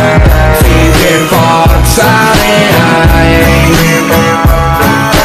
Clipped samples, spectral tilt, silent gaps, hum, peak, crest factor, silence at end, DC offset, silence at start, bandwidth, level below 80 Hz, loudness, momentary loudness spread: 1%; -5 dB/octave; none; none; 0 dBFS; 6 dB; 0 s; under 0.1%; 0 s; 15 kHz; -12 dBFS; -6 LUFS; 2 LU